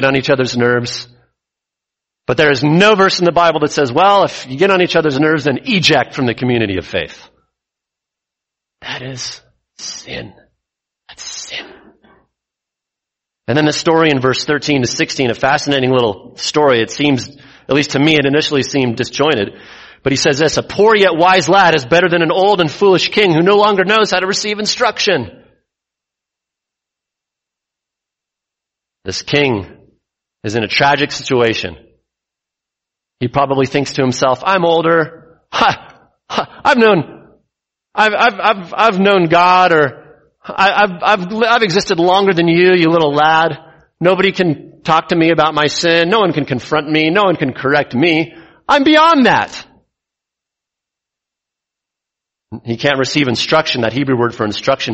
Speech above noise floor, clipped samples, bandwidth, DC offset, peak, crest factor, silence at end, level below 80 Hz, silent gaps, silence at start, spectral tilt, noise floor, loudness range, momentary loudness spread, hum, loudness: 70 dB; under 0.1%; 8.4 kHz; under 0.1%; 0 dBFS; 14 dB; 0 s; -50 dBFS; none; 0 s; -4.5 dB/octave; -83 dBFS; 12 LU; 14 LU; none; -13 LUFS